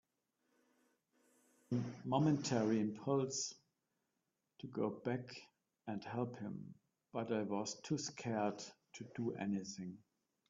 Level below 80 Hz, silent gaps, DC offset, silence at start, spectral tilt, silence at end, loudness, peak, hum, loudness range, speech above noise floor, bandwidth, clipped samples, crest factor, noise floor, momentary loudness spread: -82 dBFS; none; under 0.1%; 1.7 s; -5.5 dB/octave; 0.5 s; -41 LUFS; -22 dBFS; none; 6 LU; 48 dB; 7.8 kHz; under 0.1%; 20 dB; -88 dBFS; 16 LU